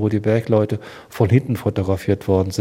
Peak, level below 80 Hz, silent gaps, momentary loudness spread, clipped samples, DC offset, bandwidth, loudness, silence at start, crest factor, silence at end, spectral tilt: -2 dBFS; -48 dBFS; none; 7 LU; under 0.1%; under 0.1%; 16 kHz; -19 LUFS; 0 s; 18 dB; 0 s; -8 dB/octave